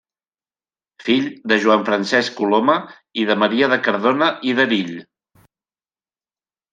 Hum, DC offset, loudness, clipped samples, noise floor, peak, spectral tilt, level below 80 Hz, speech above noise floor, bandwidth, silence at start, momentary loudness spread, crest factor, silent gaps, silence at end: none; under 0.1%; -17 LUFS; under 0.1%; under -90 dBFS; -2 dBFS; -5 dB/octave; -68 dBFS; over 72 dB; 9.4 kHz; 1 s; 7 LU; 18 dB; none; 1.7 s